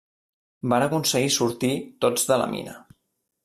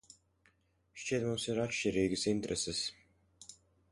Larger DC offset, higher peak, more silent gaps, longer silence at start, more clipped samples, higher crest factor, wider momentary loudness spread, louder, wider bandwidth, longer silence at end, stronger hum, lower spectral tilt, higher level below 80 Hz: neither; first, -8 dBFS vs -18 dBFS; neither; second, 0.65 s vs 0.95 s; neither; about the same, 18 dB vs 18 dB; second, 11 LU vs 21 LU; first, -23 LUFS vs -35 LUFS; first, 15.5 kHz vs 11.5 kHz; first, 0.65 s vs 0.4 s; neither; about the same, -3.5 dB/octave vs -4 dB/octave; about the same, -64 dBFS vs -62 dBFS